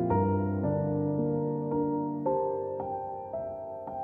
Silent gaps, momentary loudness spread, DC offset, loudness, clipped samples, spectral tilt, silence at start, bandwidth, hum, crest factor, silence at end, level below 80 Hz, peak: none; 9 LU; under 0.1%; -31 LUFS; under 0.1%; -13.5 dB/octave; 0 s; 3 kHz; none; 14 dB; 0 s; -58 dBFS; -16 dBFS